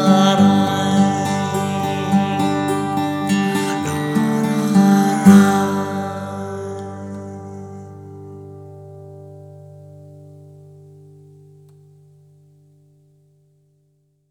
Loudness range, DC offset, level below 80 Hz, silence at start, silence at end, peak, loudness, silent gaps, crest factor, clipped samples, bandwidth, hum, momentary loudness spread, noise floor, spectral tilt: 22 LU; under 0.1%; -64 dBFS; 0 s; 4.05 s; 0 dBFS; -17 LUFS; none; 20 dB; under 0.1%; 15.5 kHz; none; 24 LU; -63 dBFS; -6 dB/octave